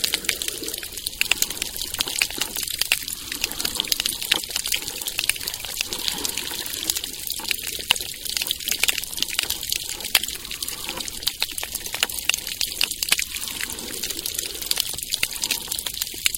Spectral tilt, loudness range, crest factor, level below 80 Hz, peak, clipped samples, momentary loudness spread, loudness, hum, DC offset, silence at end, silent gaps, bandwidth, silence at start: 0.5 dB/octave; 2 LU; 26 dB; -48 dBFS; 0 dBFS; under 0.1%; 7 LU; -24 LUFS; none; under 0.1%; 0 s; none; 17 kHz; 0 s